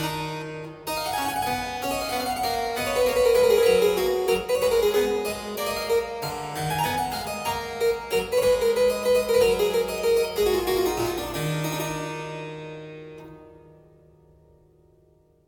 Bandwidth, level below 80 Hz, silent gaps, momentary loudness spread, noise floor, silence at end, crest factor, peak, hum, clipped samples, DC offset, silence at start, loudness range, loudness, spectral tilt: 17.5 kHz; -48 dBFS; none; 13 LU; -60 dBFS; 1.95 s; 16 dB; -8 dBFS; none; under 0.1%; under 0.1%; 0 s; 10 LU; -24 LUFS; -4 dB/octave